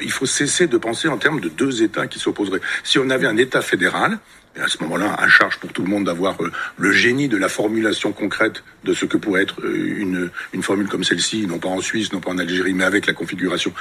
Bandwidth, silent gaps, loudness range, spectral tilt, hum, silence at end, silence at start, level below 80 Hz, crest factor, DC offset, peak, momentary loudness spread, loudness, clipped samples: 14 kHz; none; 4 LU; -3.5 dB/octave; none; 0 s; 0 s; -58 dBFS; 20 dB; under 0.1%; 0 dBFS; 7 LU; -19 LUFS; under 0.1%